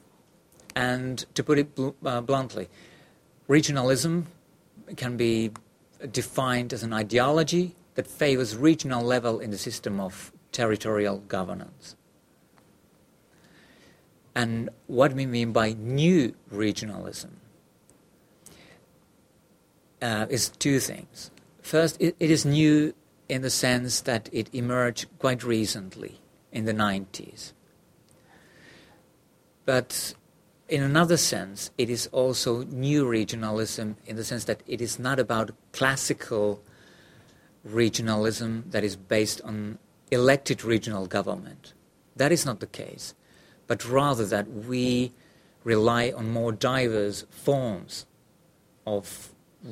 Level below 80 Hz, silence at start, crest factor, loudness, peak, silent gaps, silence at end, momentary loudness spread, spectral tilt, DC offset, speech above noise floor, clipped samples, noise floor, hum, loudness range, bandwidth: -60 dBFS; 0.75 s; 24 dB; -26 LUFS; -4 dBFS; none; 0 s; 16 LU; -4.5 dB/octave; under 0.1%; 36 dB; under 0.1%; -62 dBFS; none; 9 LU; 16 kHz